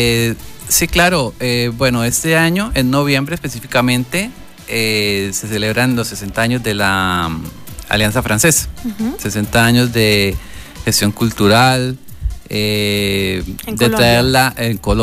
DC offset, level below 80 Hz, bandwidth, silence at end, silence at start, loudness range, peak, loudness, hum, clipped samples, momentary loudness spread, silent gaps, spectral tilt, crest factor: under 0.1%; -32 dBFS; 16 kHz; 0 s; 0 s; 2 LU; -2 dBFS; -15 LUFS; none; under 0.1%; 12 LU; none; -4 dB/octave; 14 dB